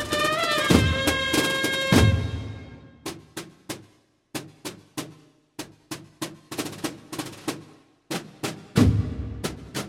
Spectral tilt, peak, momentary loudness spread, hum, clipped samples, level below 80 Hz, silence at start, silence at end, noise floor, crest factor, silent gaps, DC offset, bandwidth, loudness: -4.5 dB/octave; -2 dBFS; 20 LU; none; under 0.1%; -40 dBFS; 0 s; 0 s; -60 dBFS; 24 dB; none; under 0.1%; 16.5 kHz; -24 LUFS